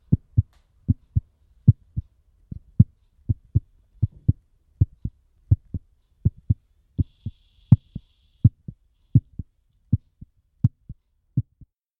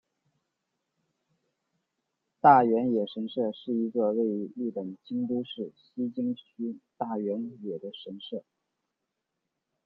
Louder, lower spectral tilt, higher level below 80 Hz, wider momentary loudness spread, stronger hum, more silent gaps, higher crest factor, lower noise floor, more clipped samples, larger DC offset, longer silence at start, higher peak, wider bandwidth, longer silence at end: first, -25 LUFS vs -29 LUFS; first, -13 dB/octave vs -9.5 dB/octave; first, -38 dBFS vs -80 dBFS; about the same, 20 LU vs 18 LU; neither; neither; about the same, 24 dB vs 24 dB; second, -61 dBFS vs -84 dBFS; neither; neither; second, 0.1 s vs 2.45 s; first, 0 dBFS vs -6 dBFS; second, 1.3 kHz vs 5.4 kHz; second, 0.6 s vs 1.45 s